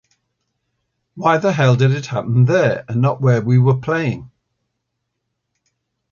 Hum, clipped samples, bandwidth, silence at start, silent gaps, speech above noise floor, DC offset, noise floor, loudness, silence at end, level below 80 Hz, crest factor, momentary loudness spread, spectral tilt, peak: none; under 0.1%; 7 kHz; 1.15 s; none; 60 dB; under 0.1%; -75 dBFS; -16 LUFS; 1.85 s; -54 dBFS; 16 dB; 6 LU; -7.5 dB/octave; -2 dBFS